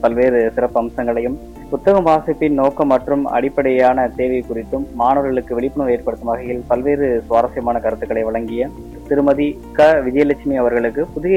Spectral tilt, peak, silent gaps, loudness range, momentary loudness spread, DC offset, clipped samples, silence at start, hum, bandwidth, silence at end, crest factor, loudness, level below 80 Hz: -7.5 dB/octave; -4 dBFS; none; 3 LU; 9 LU; 0.2%; under 0.1%; 0 s; none; 16 kHz; 0 s; 12 dB; -17 LUFS; -38 dBFS